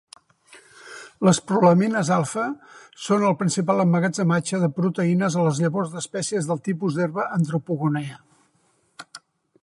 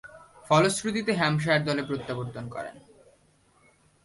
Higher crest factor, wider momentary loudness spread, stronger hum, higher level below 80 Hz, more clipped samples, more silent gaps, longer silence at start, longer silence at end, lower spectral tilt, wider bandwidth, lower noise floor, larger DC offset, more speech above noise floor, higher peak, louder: about the same, 18 dB vs 20 dB; about the same, 17 LU vs 15 LU; second, none vs 50 Hz at -45 dBFS; second, -68 dBFS vs -62 dBFS; neither; neither; first, 0.55 s vs 0.05 s; second, 0.45 s vs 1.25 s; about the same, -6 dB/octave vs -5 dB/octave; about the same, 11.5 kHz vs 11.5 kHz; about the same, -65 dBFS vs -63 dBFS; neither; first, 43 dB vs 37 dB; first, -4 dBFS vs -8 dBFS; first, -22 LUFS vs -26 LUFS